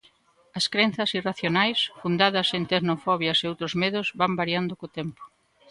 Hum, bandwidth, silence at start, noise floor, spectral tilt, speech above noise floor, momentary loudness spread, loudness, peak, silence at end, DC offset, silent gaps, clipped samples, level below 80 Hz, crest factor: none; 11.5 kHz; 0.55 s; -60 dBFS; -4.5 dB/octave; 35 dB; 11 LU; -24 LUFS; -4 dBFS; 0.45 s; under 0.1%; none; under 0.1%; -64 dBFS; 22 dB